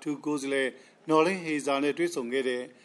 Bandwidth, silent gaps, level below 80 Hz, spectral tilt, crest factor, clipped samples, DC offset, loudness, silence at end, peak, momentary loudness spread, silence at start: 12.5 kHz; none; -80 dBFS; -4.5 dB/octave; 20 dB; under 0.1%; under 0.1%; -28 LUFS; 0.1 s; -8 dBFS; 7 LU; 0 s